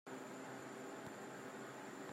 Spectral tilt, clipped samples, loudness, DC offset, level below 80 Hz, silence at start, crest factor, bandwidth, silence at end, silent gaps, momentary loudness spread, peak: -4 dB/octave; under 0.1%; -51 LUFS; under 0.1%; -88 dBFS; 0.05 s; 14 dB; 16 kHz; 0 s; none; 1 LU; -36 dBFS